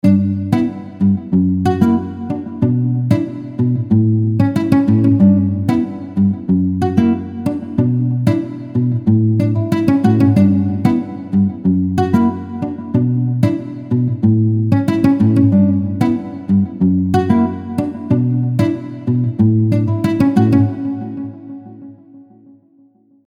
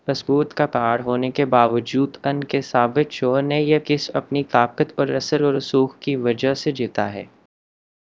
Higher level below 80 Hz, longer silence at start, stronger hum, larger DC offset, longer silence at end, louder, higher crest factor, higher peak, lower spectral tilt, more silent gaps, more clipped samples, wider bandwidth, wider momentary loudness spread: first, -48 dBFS vs -62 dBFS; about the same, 0.05 s vs 0.05 s; neither; neither; first, 1.05 s vs 0.8 s; first, -15 LUFS vs -20 LUFS; second, 14 dB vs 20 dB; about the same, 0 dBFS vs 0 dBFS; first, -9.5 dB/octave vs -6.5 dB/octave; neither; neither; first, 10.5 kHz vs 7.8 kHz; first, 9 LU vs 5 LU